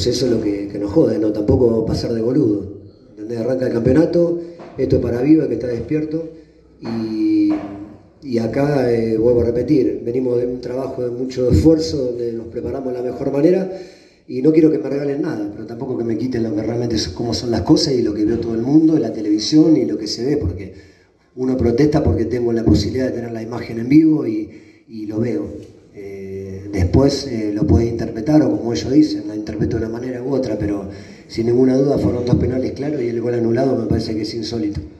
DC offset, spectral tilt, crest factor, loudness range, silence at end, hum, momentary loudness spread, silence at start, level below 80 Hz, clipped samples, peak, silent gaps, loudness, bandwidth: under 0.1%; -7 dB/octave; 16 dB; 3 LU; 0.05 s; none; 13 LU; 0 s; -38 dBFS; under 0.1%; 0 dBFS; none; -18 LUFS; 11 kHz